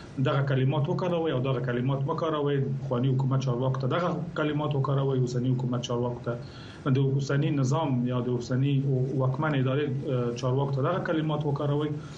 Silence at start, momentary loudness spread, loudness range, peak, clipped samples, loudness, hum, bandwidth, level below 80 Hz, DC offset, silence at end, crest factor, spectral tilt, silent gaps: 0 s; 4 LU; 1 LU; -14 dBFS; under 0.1%; -28 LUFS; none; 7.6 kHz; -58 dBFS; under 0.1%; 0 s; 12 dB; -7.5 dB/octave; none